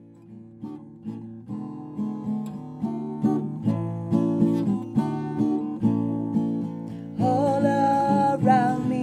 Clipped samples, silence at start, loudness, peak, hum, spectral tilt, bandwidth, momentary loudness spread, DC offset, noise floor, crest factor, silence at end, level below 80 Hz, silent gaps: under 0.1%; 0 s; -25 LUFS; -8 dBFS; none; -8.5 dB/octave; 10.5 kHz; 16 LU; under 0.1%; -45 dBFS; 18 dB; 0 s; -64 dBFS; none